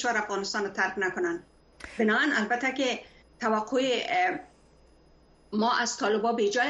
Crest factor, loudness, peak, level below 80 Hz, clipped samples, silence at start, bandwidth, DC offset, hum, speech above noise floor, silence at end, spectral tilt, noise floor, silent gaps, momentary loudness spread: 16 dB; -27 LUFS; -12 dBFS; -64 dBFS; under 0.1%; 0 s; 10.5 kHz; under 0.1%; none; 31 dB; 0 s; -3 dB/octave; -59 dBFS; none; 10 LU